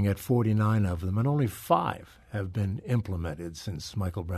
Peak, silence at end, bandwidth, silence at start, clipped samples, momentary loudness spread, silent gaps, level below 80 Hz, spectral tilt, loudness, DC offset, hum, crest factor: -10 dBFS; 0 s; 13.5 kHz; 0 s; under 0.1%; 12 LU; none; -50 dBFS; -7.5 dB/octave; -29 LUFS; under 0.1%; none; 18 dB